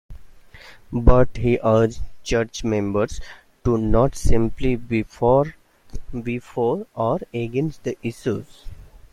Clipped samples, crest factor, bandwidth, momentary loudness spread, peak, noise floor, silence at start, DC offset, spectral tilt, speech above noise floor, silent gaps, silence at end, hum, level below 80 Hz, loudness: under 0.1%; 18 dB; 12 kHz; 12 LU; -2 dBFS; -44 dBFS; 0.1 s; under 0.1%; -7 dB/octave; 25 dB; none; 0.15 s; none; -30 dBFS; -22 LUFS